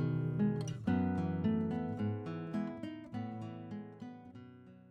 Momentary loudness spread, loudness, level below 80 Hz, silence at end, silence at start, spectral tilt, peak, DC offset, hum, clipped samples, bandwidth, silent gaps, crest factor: 17 LU; -38 LUFS; -66 dBFS; 0 s; 0 s; -8.5 dB/octave; -22 dBFS; under 0.1%; none; under 0.1%; 9.6 kHz; none; 16 dB